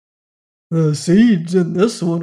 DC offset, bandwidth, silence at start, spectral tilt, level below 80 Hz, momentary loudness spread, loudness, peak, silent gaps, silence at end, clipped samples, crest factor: under 0.1%; 11.5 kHz; 0.7 s; -7 dB/octave; -56 dBFS; 6 LU; -15 LUFS; -4 dBFS; none; 0 s; under 0.1%; 12 dB